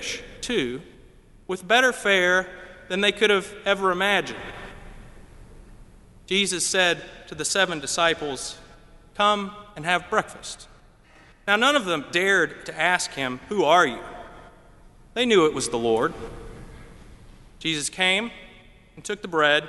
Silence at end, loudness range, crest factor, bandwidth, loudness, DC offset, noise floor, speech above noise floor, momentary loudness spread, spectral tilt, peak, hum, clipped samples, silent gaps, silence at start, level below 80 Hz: 0 s; 5 LU; 22 dB; 11.5 kHz; -22 LUFS; under 0.1%; -53 dBFS; 30 dB; 19 LU; -2.5 dB/octave; -4 dBFS; none; under 0.1%; none; 0 s; -50 dBFS